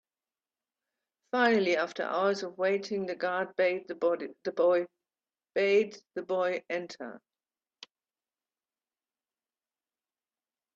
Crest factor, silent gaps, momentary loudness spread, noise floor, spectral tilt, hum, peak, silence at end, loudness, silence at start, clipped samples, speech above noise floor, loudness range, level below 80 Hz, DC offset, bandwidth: 20 dB; none; 11 LU; under -90 dBFS; -5 dB/octave; none; -12 dBFS; 3.6 s; -30 LUFS; 1.35 s; under 0.1%; over 61 dB; 9 LU; -82 dBFS; under 0.1%; 7.6 kHz